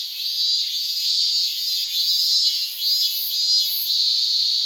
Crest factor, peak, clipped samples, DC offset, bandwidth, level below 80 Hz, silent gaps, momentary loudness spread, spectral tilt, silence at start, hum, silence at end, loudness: 14 dB; -6 dBFS; under 0.1%; under 0.1%; 19.5 kHz; under -90 dBFS; none; 4 LU; 8 dB/octave; 0 s; none; 0 s; -18 LUFS